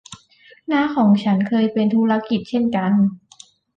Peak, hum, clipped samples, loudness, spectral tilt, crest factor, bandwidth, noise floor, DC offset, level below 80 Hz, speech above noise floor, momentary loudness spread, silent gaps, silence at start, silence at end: -6 dBFS; none; under 0.1%; -18 LUFS; -7.5 dB/octave; 14 dB; 7.6 kHz; -51 dBFS; under 0.1%; -60 dBFS; 34 dB; 6 LU; none; 0.1 s; 0.6 s